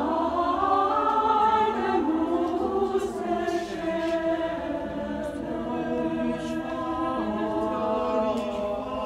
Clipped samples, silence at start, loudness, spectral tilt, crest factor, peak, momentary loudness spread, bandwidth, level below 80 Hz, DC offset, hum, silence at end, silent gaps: under 0.1%; 0 s; -26 LUFS; -6 dB/octave; 16 dB; -10 dBFS; 8 LU; 12.5 kHz; -50 dBFS; under 0.1%; none; 0 s; none